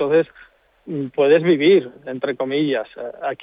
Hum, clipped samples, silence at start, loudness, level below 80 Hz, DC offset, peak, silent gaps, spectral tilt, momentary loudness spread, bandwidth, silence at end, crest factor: none; under 0.1%; 0 s; -19 LUFS; -66 dBFS; under 0.1%; -4 dBFS; none; -9.5 dB/octave; 15 LU; 5 kHz; 0.1 s; 16 dB